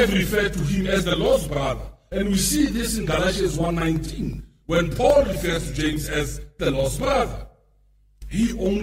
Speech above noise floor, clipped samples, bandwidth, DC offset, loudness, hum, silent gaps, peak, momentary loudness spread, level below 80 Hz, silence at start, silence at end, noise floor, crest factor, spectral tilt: 36 dB; under 0.1%; 16 kHz; under 0.1%; -23 LUFS; none; none; -4 dBFS; 10 LU; -34 dBFS; 0 s; 0 s; -58 dBFS; 18 dB; -5 dB/octave